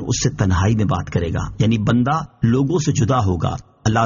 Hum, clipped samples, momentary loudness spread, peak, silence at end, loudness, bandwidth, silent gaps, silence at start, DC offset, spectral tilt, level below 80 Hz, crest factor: none; under 0.1%; 5 LU; -4 dBFS; 0 s; -19 LUFS; 7.4 kHz; none; 0 s; under 0.1%; -6.5 dB/octave; -36 dBFS; 14 dB